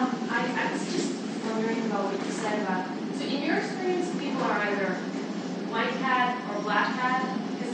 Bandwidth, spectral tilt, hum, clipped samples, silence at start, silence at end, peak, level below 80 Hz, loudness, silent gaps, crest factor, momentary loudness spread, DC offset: 9.6 kHz; -5 dB/octave; none; under 0.1%; 0 s; 0 s; -12 dBFS; -82 dBFS; -28 LUFS; none; 16 dB; 6 LU; under 0.1%